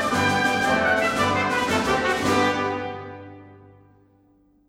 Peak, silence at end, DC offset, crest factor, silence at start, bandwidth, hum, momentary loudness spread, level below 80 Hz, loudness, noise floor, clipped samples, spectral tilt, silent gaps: -8 dBFS; 1.15 s; under 0.1%; 14 dB; 0 s; 16.5 kHz; none; 13 LU; -50 dBFS; -21 LUFS; -59 dBFS; under 0.1%; -4 dB/octave; none